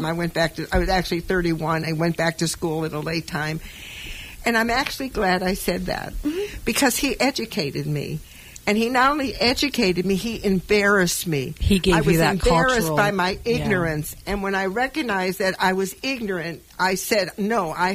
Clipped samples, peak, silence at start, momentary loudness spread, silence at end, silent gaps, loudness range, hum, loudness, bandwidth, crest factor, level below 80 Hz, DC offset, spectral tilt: under 0.1%; -6 dBFS; 0 s; 9 LU; 0 s; none; 5 LU; none; -22 LUFS; 16 kHz; 16 dB; -38 dBFS; under 0.1%; -4.5 dB/octave